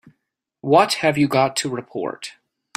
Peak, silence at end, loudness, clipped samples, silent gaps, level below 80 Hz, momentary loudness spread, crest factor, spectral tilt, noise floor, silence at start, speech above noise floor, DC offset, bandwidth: -2 dBFS; 0.45 s; -19 LUFS; under 0.1%; none; -64 dBFS; 17 LU; 20 dB; -4.5 dB/octave; -77 dBFS; 0.65 s; 58 dB; under 0.1%; 16 kHz